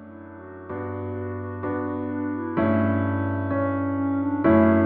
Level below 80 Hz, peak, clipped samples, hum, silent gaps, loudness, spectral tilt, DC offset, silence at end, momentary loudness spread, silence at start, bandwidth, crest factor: -56 dBFS; -6 dBFS; under 0.1%; none; none; -25 LUFS; -12.5 dB/octave; under 0.1%; 0 s; 15 LU; 0 s; 4.2 kHz; 18 dB